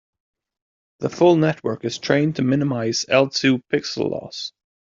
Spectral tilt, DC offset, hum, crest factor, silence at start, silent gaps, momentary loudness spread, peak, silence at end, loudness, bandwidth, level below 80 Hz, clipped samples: -5.5 dB/octave; under 0.1%; none; 18 dB; 1 s; none; 13 LU; -2 dBFS; 0.45 s; -20 LUFS; 7.6 kHz; -62 dBFS; under 0.1%